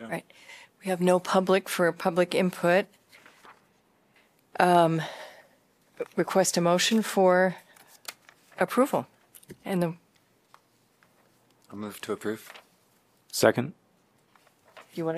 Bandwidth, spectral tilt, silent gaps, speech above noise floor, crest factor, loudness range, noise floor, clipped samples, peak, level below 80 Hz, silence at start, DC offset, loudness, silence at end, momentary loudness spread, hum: 15.5 kHz; -4.5 dB/octave; none; 40 dB; 26 dB; 11 LU; -66 dBFS; under 0.1%; -4 dBFS; -74 dBFS; 0 s; under 0.1%; -26 LUFS; 0 s; 21 LU; none